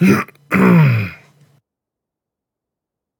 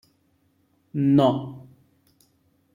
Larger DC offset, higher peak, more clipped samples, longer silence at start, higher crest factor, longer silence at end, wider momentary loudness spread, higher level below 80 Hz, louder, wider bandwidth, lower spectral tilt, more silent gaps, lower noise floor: neither; first, 0 dBFS vs -6 dBFS; neither; second, 0 s vs 0.95 s; about the same, 18 dB vs 20 dB; first, 2.05 s vs 1.1 s; second, 10 LU vs 21 LU; first, -56 dBFS vs -66 dBFS; first, -14 LUFS vs -22 LUFS; first, 18.5 kHz vs 7.2 kHz; about the same, -8 dB/octave vs -9 dB/octave; neither; first, -83 dBFS vs -66 dBFS